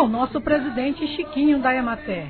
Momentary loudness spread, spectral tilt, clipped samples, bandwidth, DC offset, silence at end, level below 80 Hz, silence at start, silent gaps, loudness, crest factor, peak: 7 LU; -9.5 dB/octave; under 0.1%; 4.5 kHz; under 0.1%; 0 s; -46 dBFS; 0 s; none; -22 LUFS; 16 dB; -4 dBFS